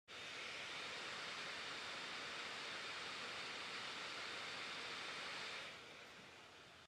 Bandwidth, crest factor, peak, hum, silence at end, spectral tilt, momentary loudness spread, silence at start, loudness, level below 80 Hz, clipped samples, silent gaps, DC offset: 15 kHz; 14 dB; -36 dBFS; none; 0 s; -1 dB/octave; 9 LU; 0.1 s; -47 LUFS; -84 dBFS; under 0.1%; none; under 0.1%